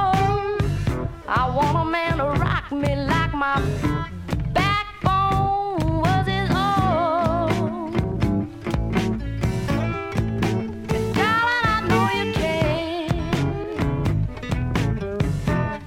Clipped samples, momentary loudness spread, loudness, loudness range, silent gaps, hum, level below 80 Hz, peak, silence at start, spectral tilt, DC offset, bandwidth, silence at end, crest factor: under 0.1%; 6 LU; -22 LUFS; 3 LU; none; none; -34 dBFS; -6 dBFS; 0 s; -6.5 dB/octave; under 0.1%; 16 kHz; 0 s; 16 dB